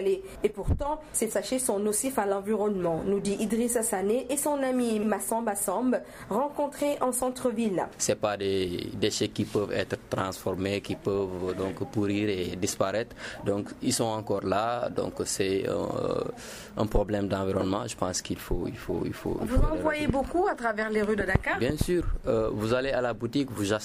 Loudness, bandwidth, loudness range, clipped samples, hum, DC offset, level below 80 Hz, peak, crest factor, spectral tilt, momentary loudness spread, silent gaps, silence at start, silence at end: -29 LUFS; 15.5 kHz; 3 LU; under 0.1%; none; under 0.1%; -40 dBFS; -8 dBFS; 20 dB; -4.5 dB/octave; 5 LU; none; 0 s; 0 s